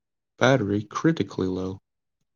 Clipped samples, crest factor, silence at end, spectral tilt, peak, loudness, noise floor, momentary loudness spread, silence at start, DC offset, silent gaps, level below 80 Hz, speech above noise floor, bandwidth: under 0.1%; 22 dB; 0.55 s; -6 dB/octave; -4 dBFS; -25 LUFS; -83 dBFS; 12 LU; 0.4 s; under 0.1%; none; -68 dBFS; 59 dB; 7.2 kHz